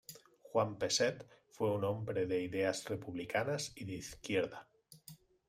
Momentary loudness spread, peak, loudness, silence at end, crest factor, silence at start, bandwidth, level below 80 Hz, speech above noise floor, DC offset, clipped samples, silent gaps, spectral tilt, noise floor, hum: 22 LU; -20 dBFS; -37 LUFS; 0.35 s; 18 dB; 0.1 s; 16 kHz; -70 dBFS; 23 dB; under 0.1%; under 0.1%; none; -4 dB/octave; -59 dBFS; none